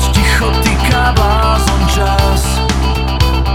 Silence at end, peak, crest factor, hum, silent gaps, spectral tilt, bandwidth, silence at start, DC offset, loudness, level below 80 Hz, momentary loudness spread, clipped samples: 0 s; 0 dBFS; 10 dB; none; none; -4.5 dB/octave; 16 kHz; 0 s; under 0.1%; -12 LUFS; -14 dBFS; 3 LU; under 0.1%